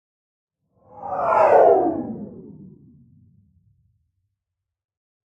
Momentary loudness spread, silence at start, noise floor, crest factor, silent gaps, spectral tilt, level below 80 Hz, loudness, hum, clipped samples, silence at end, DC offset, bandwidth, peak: 24 LU; 0.95 s; -84 dBFS; 20 dB; none; -8 dB/octave; -64 dBFS; -17 LUFS; none; under 0.1%; 2.75 s; under 0.1%; 7.6 kHz; -4 dBFS